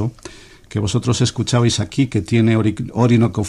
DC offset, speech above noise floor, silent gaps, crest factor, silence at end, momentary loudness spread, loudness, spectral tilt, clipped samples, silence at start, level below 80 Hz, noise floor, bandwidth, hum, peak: under 0.1%; 23 dB; none; 14 dB; 0 s; 11 LU; -17 LUFS; -6 dB/octave; under 0.1%; 0 s; -44 dBFS; -39 dBFS; 11.5 kHz; none; -4 dBFS